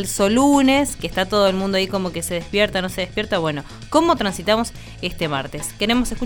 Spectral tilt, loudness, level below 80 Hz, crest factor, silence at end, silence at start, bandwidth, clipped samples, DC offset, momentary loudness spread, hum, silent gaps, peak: -4 dB/octave; -20 LUFS; -38 dBFS; 18 dB; 0 s; 0 s; over 20 kHz; under 0.1%; under 0.1%; 10 LU; none; none; -2 dBFS